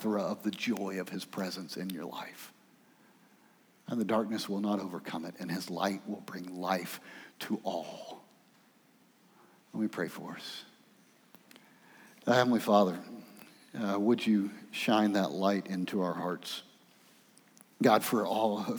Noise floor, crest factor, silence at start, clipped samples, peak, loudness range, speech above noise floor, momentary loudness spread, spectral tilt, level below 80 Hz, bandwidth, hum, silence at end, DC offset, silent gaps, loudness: -65 dBFS; 24 dB; 0 s; under 0.1%; -10 dBFS; 11 LU; 33 dB; 18 LU; -5.5 dB/octave; -90 dBFS; over 20 kHz; none; 0 s; under 0.1%; none; -33 LUFS